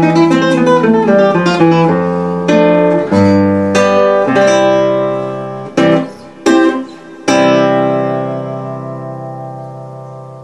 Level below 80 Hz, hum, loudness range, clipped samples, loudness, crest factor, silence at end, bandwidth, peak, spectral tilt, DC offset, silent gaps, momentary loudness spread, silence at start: -54 dBFS; none; 5 LU; under 0.1%; -11 LUFS; 12 dB; 0 s; 11 kHz; 0 dBFS; -6.5 dB/octave; 0.4%; none; 16 LU; 0 s